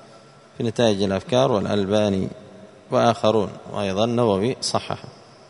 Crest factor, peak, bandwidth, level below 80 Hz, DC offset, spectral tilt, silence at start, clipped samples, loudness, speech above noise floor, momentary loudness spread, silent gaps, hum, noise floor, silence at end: 20 dB; -2 dBFS; 11 kHz; -58 dBFS; under 0.1%; -5.5 dB/octave; 0.6 s; under 0.1%; -22 LUFS; 27 dB; 9 LU; none; none; -48 dBFS; 0.35 s